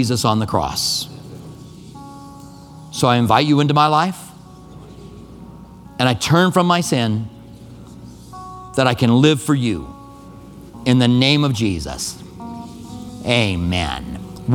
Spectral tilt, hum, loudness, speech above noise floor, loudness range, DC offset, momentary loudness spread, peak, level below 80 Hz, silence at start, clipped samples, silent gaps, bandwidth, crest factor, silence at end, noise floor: -5 dB/octave; none; -17 LUFS; 23 dB; 3 LU; under 0.1%; 25 LU; 0 dBFS; -42 dBFS; 0 s; under 0.1%; none; 17.5 kHz; 18 dB; 0 s; -39 dBFS